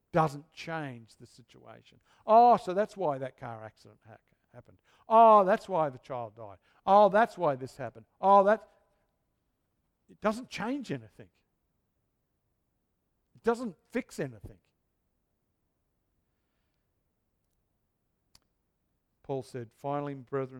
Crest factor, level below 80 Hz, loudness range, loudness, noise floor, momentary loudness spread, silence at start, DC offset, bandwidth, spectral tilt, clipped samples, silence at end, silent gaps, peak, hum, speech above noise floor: 22 dB; -70 dBFS; 16 LU; -27 LUFS; -79 dBFS; 21 LU; 0.15 s; under 0.1%; 12.5 kHz; -6.5 dB/octave; under 0.1%; 0 s; none; -10 dBFS; none; 50 dB